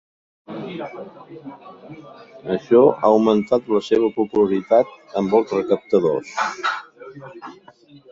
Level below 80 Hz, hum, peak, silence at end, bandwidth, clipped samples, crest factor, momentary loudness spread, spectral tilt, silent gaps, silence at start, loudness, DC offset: -62 dBFS; none; -2 dBFS; 0.6 s; 7.6 kHz; under 0.1%; 18 dB; 24 LU; -6.5 dB/octave; none; 0.5 s; -19 LUFS; under 0.1%